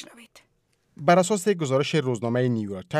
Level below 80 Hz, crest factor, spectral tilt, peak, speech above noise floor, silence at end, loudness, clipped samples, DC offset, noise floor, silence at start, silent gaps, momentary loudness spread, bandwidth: -70 dBFS; 18 dB; -5.5 dB/octave; -6 dBFS; 46 dB; 0 s; -23 LUFS; under 0.1%; under 0.1%; -69 dBFS; 0 s; none; 7 LU; 15 kHz